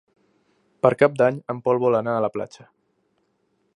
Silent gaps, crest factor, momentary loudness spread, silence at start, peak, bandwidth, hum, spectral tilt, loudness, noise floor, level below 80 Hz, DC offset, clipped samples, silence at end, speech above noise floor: none; 22 dB; 9 LU; 0.85 s; -2 dBFS; 11 kHz; none; -7.5 dB/octave; -21 LUFS; -69 dBFS; -68 dBFS; under 0.1%; under 0.1%; 1.3 s; 48 dB